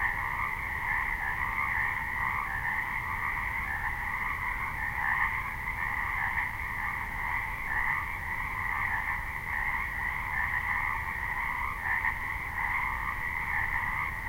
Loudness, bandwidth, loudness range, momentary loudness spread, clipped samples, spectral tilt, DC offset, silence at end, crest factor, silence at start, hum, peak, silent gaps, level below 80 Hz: -31 LUFS; 16 kHz; 1 LU; 4 LU; under 0.1%; -4.5 dB/octave; under 0.1%; 0 s; 16 dB; 0 s; none; -16 dBFS; none; -44 dBFS